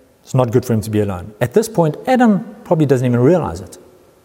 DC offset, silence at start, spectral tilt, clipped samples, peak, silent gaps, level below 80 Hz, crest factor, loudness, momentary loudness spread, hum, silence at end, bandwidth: under 0.1%; 0.3 s; -7.5 dB/octave; under 0.1%; 0 dBFS; none; -48 dBFS; 14 dB; -16 LUFS; 8 LU; none; 0.5 s; 16.5 kHz